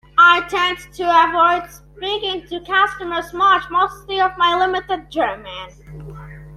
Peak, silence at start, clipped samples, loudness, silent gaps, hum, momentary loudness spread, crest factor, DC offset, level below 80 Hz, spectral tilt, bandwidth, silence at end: -2 dBFS; 0.15 s; under 0.1%; -17 LUFS; none; none; 22 LU; 16 dB; under 0.1%; -46 dBFS; -3.5 dB/octave; 14.5 kHz; 0 s